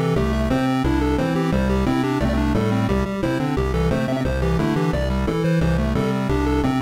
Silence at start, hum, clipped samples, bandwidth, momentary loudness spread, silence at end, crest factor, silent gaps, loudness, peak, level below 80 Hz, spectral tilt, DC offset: 0 s; none; under 0.1%; 16 kHz; 2 LU; 0 s; 10 dB; none; -21 LUFS; -10 dBFS; -28 dBFS; -7.5 dB/octave; under 0.1%